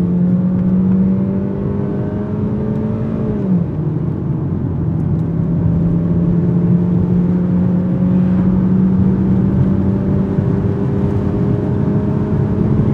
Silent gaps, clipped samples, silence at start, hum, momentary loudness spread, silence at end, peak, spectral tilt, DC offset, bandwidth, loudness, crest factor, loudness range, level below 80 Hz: none; under 0.1%; 0 s; none; 5 LU; 0 s; -2 dBFS; -12 dB/octave; under 0.1%; 3.5 kHz; -16 LUFS; 12 dB; 4 LU; -32 dBFS